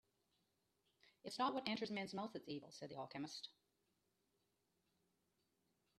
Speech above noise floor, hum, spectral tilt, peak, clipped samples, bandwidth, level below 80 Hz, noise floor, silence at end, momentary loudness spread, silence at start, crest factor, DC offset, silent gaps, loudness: 39 dB; none; -4.5 dB/octave; -24 dBFS; under 0.1%; 13 kHz; -90 dBFS; -86 dBFS; 2.5 s; 12 LU; 1.25 s; 28 dB; under 0.1%; none; -47 LUFS